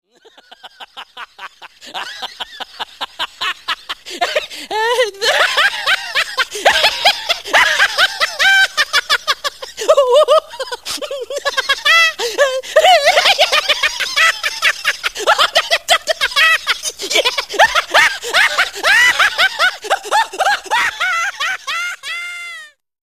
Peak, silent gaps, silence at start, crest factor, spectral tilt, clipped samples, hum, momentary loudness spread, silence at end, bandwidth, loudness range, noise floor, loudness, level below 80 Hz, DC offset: 0 dBFS; none; 0.65 s; 16 dB; 1 dB/octave; under 0.1%; none; 16 LU; 0.35 s; 16 kHz; 9 LU; -45 dBFS; -13 LUFS; -54 dBFS; 0.4%